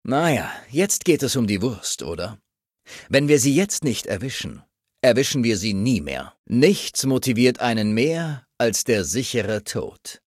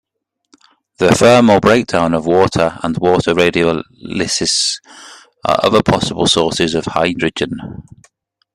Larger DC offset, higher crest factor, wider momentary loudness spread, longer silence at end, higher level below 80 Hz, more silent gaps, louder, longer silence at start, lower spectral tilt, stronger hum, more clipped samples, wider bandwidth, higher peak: neither; first, 20 dB vs 14 dB; about the same, 12 LU vs 13 LU; second, 0.1 s vs 0.75 s; second, -52 dBFS vs -44 dBFS; first, 6.39-6.44 s vs none; second, -21 LUFS vs -13 LUFS; second, 0.05 s vs 1 s; about the same, -4.5 dB/octave vs -4.5 dB/octave; neither; neither; about the same, 15.5 kHz vs 14.5 kHz; about the same, -2 dBFS vs 0 dBFS